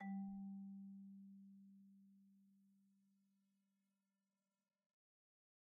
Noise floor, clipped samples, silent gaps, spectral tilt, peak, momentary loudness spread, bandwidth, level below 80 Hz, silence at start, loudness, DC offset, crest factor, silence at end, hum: under -90 dBFS; under 0.1%; none; -7 dB/octave; -42 dBFS; 17 LU; 2 kHz; under -90 dBFS; 0 s; -55 LUFS; under 0.1%; 16 dB; 2.7 s; none